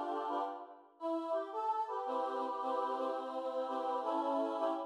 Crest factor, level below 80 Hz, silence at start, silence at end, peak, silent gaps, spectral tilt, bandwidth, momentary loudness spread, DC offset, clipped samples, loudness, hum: 14 dB; under -90 dBFS; 0 s; 0 s; -24 dBFS; none; -3.5 dB/octave; 11.5 kHz; 5 LU; under 0.1%; under 0.1%; -38 LUFS; none